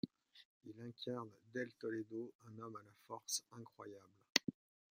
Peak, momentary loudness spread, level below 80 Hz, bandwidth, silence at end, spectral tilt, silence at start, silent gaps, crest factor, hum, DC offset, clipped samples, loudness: -10 dBFS; 21 LU; -86 dBFS; 15.5 kHz; 0.45 s; -2.5 dB/octave; 0.05 s; 0.45-0.61 s, 2.35-2.39 s, 4.30-4.35 s; 36 dB; none; under 0.1%; under 0.1%; -45 LUFS